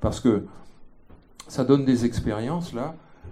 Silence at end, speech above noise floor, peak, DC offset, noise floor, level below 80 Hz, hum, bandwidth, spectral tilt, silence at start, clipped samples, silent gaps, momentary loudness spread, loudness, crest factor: 0 s; 26 dB; -6 dBFS; under 0.1%; -50 dBFS; -42 dBFS; none; 13.5 kHz; -7 dB/octave; 0 s; under 0.1%; none; 15 LU; -25 LUFS; 20 dB